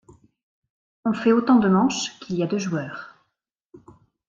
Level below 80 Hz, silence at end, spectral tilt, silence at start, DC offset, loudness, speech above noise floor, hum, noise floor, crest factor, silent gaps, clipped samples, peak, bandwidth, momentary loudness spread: -62 dBFS; 0.5 s; -5.5 dB/octave; 1.05 s; under 0.1%; -22 LUFS; 57 dB; none; -78 dBFS; 18 dB; 3.66-3.70 s; under 0.1%; -6 dBFS; 7.8 kHz; 12 LU